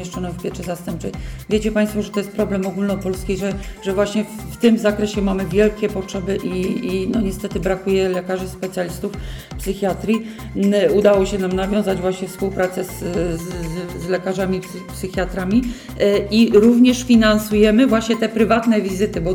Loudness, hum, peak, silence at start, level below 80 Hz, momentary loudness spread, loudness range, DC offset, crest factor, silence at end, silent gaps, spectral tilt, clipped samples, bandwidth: -19 LUFS; none; -4 dBFS; 0 s; -36 dBFS; 13 LU; 8 LU; under 0.1%; 16 dB; 0 s; none; -6 dB/octave; under 0.1%; 17.5 kHz